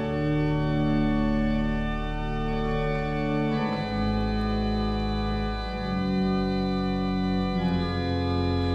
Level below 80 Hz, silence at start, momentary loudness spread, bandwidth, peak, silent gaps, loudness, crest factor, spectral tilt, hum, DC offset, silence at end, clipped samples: -34 dBFS; 0 s; 4 LU; 8.4 kHz; -14 dBFS; none; -27 LUFS; 12 dB; -8 dB/octave; none; under 0.1%; 0 s; under 0.1%